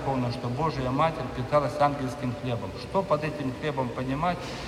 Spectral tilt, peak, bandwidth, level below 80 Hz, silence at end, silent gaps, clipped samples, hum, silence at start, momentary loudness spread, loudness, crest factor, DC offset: -7 dB/octave; -10 dBFS; 14.5 kHz; -48 dBFS; 0 s; none; under 0.1%; none; 0 s; 6 LU; -28 LUFS; 18 dB; under 0.1%